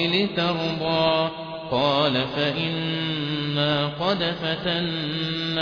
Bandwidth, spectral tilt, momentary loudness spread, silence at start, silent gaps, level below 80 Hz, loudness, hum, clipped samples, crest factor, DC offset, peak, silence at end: 5.4 kHz; -6.5 dB/octave; 5 LU; 0 s; none; -54 dBFS; -23 LUFS; none; under 0.1%; 16 dB; under 0.1%; -8 dBFS; 0 s